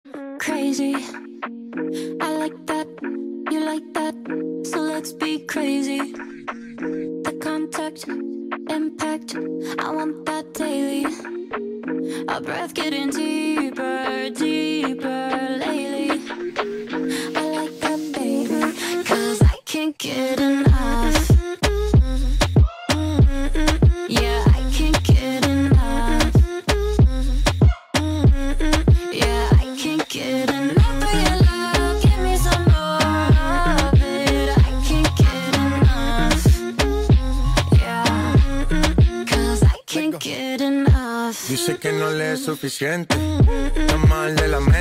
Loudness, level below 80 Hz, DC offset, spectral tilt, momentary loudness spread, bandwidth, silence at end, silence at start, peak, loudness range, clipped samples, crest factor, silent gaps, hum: -20 LUFS; -24 dBFS; under 0.1%; -5.5 dB/octave; 10 LU; 16 kHz; 0 s; 0.05 s; -6 dBFS; 8 LU; under 0.1%; 12 dB; none; none